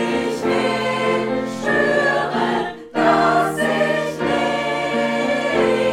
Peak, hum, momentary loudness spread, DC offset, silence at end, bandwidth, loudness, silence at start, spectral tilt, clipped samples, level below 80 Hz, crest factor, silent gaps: -2 dBFS; none; 5 LU; under 0.1%; 0 s; 16 kHz; -19 LUFS; 0 s; -5 dB/octave; under 0.1%; -54 dBFS; 16 dB; none